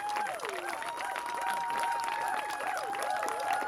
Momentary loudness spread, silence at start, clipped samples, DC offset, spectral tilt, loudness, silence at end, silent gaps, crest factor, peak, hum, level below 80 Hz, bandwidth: 4 LU; 0 s; under 0.1%; under 0.1%; -1 dB/octave; -34 LUFS; 0 s; none; 20 dB; -14 dBFS; none; -74 dBFS; 17 kHz